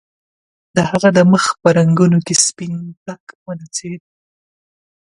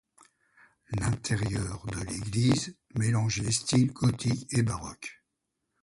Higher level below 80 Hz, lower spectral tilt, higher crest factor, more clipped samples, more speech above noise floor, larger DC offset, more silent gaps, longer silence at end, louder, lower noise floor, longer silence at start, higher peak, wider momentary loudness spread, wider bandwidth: about the same, -54 dBFS vs -50 dBFS; about the same, -5 dB/octave vs -5 dB/octave; about the same, 16 dB vs 18 dB; neither; first, over 75 dB vs 54 dB; neither; first, 2.97-3.06 s, 3.20-3.27 s, 3.35-3.46 s vs none; first, 1.05 s vs 0.7 s; first, -14 LUFS vs -29 LUFS; first, under -90 dBFS vs -82 dBFS; second, 0.75 s vs 0.9 s; first, 0 dBFS vs -12 dBFS; first, 20 LU vs 11 LU; about the same, 11.5 kHz vs 11.5 kHz